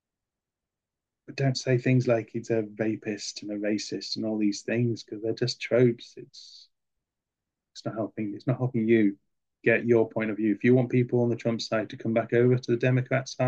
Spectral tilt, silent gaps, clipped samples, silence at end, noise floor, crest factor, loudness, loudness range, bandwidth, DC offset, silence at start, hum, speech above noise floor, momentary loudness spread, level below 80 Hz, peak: -6.5 dB/octave; none; under 0.1%; 0 s; -89 dBFS; 18 dB; -27 LUFS; 6 LU; 8.2 kHz; under 0.1%; 1.3 s; none; 63 dB; 10 LU; -72 dBFS; -10 dBFS